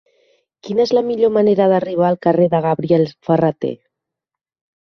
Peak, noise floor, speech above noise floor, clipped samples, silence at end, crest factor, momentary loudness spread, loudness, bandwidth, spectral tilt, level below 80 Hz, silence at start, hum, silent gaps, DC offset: -2 dBFS; -85 dBFS; 70 dB; under 0.1%; 1.1 s; 16 dB; 8 LU; -16 LUFS; 6.4 kHz; -8 dB/octave; -60 dBFS; 0.65 s; none; none; under 0.1%